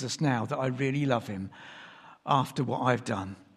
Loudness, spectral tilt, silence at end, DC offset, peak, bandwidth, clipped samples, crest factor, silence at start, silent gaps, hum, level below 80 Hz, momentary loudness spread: -29 LUFS; -6 dB/octave; 0.15 s; under 0.1%; -10 dBFS; 13.5 kHz; under 0.1%; 20 dB; 0 s; none; none; -70 dBFS; 18 LU